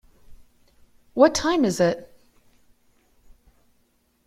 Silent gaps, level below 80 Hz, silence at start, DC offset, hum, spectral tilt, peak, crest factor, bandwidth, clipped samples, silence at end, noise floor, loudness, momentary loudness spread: none; -54 dBFS; 0.3 s; under 0.1%; none; -4.5 dB/octave; -2 dBFS; 24 dB; 15.5 kHz; under 0.1%; 2.2 s; -66 dBFS; -21 LUFS; 15 LU